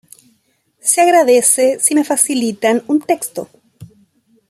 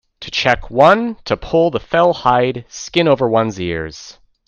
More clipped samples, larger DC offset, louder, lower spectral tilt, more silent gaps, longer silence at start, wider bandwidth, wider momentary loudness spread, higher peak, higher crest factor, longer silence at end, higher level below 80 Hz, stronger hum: neither; neither; about the same, -13 LUFS vs -15 LUFS; second, -2.5 dB/octave vs -5 dB/octave; neither; first, 0.85 s vs 0.2 s; first, 15.5 kHz vs 7.8 kHz; about the same, 9 LU vs 11 LU; about the same, 0 dBFS vs 0 dBFS; about the same, 16 dB vs 16 dB; first, 0.65 s vs 0.35 s; second, -66 dBFS vs -42 dBFS; neither